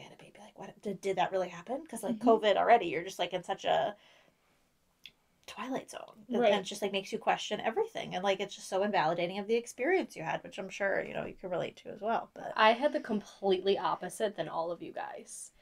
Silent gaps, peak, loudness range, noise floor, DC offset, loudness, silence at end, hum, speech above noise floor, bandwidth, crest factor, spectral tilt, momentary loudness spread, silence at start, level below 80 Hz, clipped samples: none; -10 dBFS; 5 LU; -72 dBFS; under 0.1%; -32 LUFS; 0.15 s; none; 40 dB; 15.5 kHz; 22 dB; -4 dB/octave; 15 LU; 0 s; -72 dBFS; under 0.1%